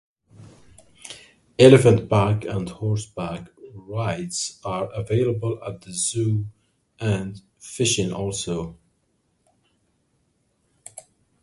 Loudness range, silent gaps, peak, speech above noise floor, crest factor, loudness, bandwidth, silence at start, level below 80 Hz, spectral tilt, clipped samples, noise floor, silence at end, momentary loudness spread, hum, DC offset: 9 LU; none; 0 dBFS; 48 dB; 24 dB; -22 LUFS; 11.5 kHz; 0.4 s; -50 dBFS; -5.5 dB/octave; under 0.1%; -69 dBFS; 0.45 s; 26 LU; none; under 0.1%